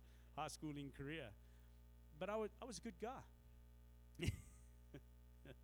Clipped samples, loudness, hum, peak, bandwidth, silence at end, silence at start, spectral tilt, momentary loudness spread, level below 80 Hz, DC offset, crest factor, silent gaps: under 0.1%; -51 LUFS; 60 Hz at -65 dBFS; -28 dBFS; over 20 kHz; 0 s; 0 s; -5 dB/octave; 19 LU; -62 dBFS; under 0.1%; 26 dB; none